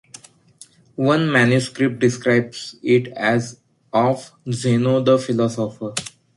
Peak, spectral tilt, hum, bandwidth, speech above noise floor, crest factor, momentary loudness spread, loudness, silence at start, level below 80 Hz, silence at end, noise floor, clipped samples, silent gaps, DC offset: -2 dBFS; -6 dB/octave; none; 11.5 kHz; 30 dB; 16 dB; 12 LU; -19 LUFS; 1 s; -60 dBFS; 0.25 s; -49 dBFS; under 0.1%; none; under 0.1%